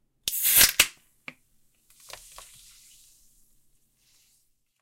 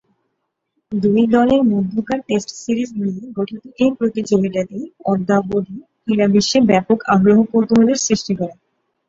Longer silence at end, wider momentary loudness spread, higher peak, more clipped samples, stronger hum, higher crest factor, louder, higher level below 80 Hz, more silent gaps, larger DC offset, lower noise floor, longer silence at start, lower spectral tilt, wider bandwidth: first, 3.9 s vs 0.55 s; first, 29 LU vs 12 LU; about the same, -4 dBFS vs -2 dBFS; neither; neither; first, 26 dB vs 16 dB; second, -20 LUFS vs -17 LUFS; about the same, -54 dBFS vs -52 dBFS; neither; neither; second, -69 dBFS vs -73 dBFS; second, 0.25 s vs 0.9 s; second, 1.5 dB/octave vs -5.5 dB/octave; first, 16.5 kHz vs 7.8 kHz